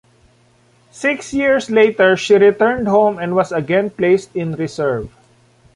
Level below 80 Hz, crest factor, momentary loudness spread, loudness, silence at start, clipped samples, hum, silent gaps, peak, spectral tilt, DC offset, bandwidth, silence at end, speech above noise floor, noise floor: -50 dBFS; 14 dB; 10 LU; -15 LUFS; 0.95 s; under 0.1%; none; none; -2 dBFS; -5.5 dB/octave; under 0.1%; 11 kHz; 0.65 s; 39 dB; -53 dBFS